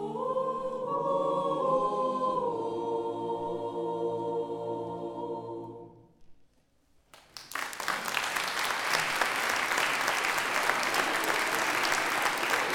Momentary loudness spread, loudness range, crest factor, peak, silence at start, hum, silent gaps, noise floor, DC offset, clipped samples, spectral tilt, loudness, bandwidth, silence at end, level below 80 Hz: 10 LU; 11 LU; 20 dB; -10 dBFS; 0 s; none; none; -66 dBFS; under 0.1%; under 0.1%; -2 dB/octave; -30 LUFS; over 20 kHz; 0 s; -68 dBFS